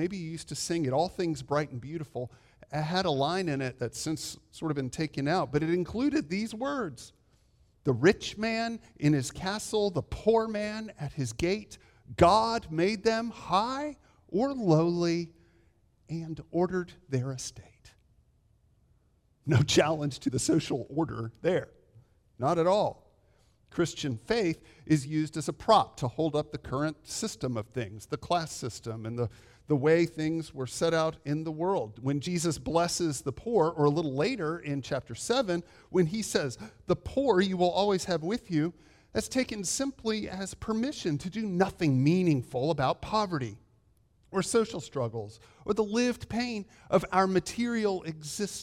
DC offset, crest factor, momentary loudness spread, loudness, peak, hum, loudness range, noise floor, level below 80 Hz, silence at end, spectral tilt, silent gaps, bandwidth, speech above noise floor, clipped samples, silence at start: under 0.1%; 22 dB; 12 LU; -30 LUFS; -8 dBFS; none; 4 LU; -67 dBFS; -56 dBFS; 0 s; -5.5 dB/octave; none; 16 kHz; 38 dB; under 0.1%; 0 s